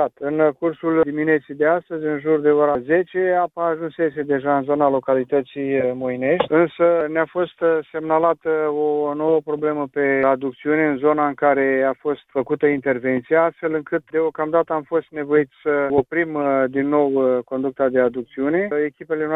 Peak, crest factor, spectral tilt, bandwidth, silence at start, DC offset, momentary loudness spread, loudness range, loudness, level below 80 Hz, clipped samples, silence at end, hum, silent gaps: -2 dBFS; 16 dB; -9.5 dB/octave; 4 kHz; 0 s; under 0.1%; 6 LU; 1 LU; -20 LUFS; -60 dBFS; under 0.1%; 0 s; none; none